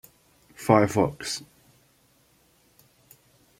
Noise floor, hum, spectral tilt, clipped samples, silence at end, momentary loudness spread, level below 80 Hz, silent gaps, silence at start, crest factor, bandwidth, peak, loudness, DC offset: -63 dBFS; none; -5.5 dB/octave; under 0.1%; 2.15 s; 14 LU; -60 dBFS; none; 0.6 s; 26 dB; 16.5 kHz; -4 dBFS; -24 LUFS; under 0.1%